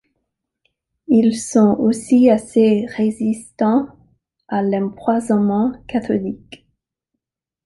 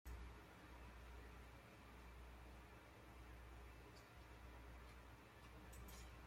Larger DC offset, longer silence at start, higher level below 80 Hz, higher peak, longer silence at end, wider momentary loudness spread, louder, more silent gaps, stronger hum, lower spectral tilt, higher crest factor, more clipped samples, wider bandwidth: neither; first, 1.1 s vs 0.05 s; first, -54 dBFS vs -62 dBFS; first, -2 dBFS vs -44 dBFS; first, 1.1 s vs 0 s; first, 9 LU vs 4 LU; first, -17 LUFS vs -62 LUFS; neither; neither; first, -6.5 dB/octave vs -5 dB/octave; about the same, 16 dB vs 14 dB; neither; second, 11.5 kHz vs 16.5 kHz